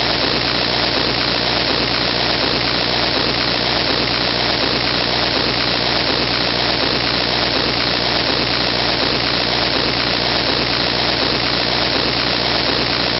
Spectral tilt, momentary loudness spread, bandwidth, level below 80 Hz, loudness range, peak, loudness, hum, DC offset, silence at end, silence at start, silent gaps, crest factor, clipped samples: -5 dB/octave; 0 LU; 7.4 kHz; -36 dBFS; 0 LU; -4 dBFS; -15 LUFS; 60 Hz at -30 dBFS; under 0.1%; 0 s; 0 s; none; 14 dB; under 0.1%